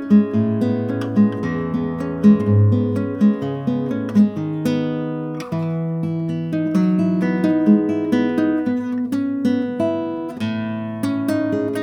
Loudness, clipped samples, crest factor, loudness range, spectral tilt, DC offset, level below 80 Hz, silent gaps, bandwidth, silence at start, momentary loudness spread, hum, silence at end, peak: -19 LUFS; under 0.1%; 16 dB; 3 LU; -9 dB/octave; under 0.1%; -58 dBFS; none; 11.5 kHz; 0 s; 9 LU; none; 0 s; -2 dBFS